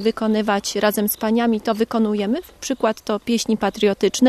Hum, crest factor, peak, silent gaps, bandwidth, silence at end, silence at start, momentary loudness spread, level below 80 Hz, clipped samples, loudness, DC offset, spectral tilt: none; 16 dB; -2 dBFS; none; 14 kHz; 0 s; 0 s; 4 LU; -52 dBFS; under 0.1%; -20 LUFS; under 0.1%; -4.5 dB/octave